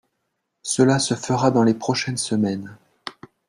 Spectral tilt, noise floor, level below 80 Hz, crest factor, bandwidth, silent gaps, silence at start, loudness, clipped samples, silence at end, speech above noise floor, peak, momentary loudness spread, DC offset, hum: -5 dB/octave; -76 dBFS; -58 dBFS; 18 dB; 12.5 kHz; none; 0.65 s; -20 LUFS; under 0.1%; 0.4 s; 56 dB; -4 dBFS; 19 LU; under 0.1%; none